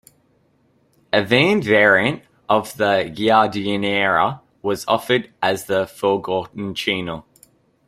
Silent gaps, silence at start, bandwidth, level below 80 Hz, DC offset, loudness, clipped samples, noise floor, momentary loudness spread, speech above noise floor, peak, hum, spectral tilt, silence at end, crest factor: none; 1.15 s; 16 kHz; -56 dBFS; under 0.1%; -19 LUFS; under 0.1%; -60 dBFS; 10 LU; 42 dB; -2 dBFS; none; -5 dB/octave; 0.65 s; 18 dB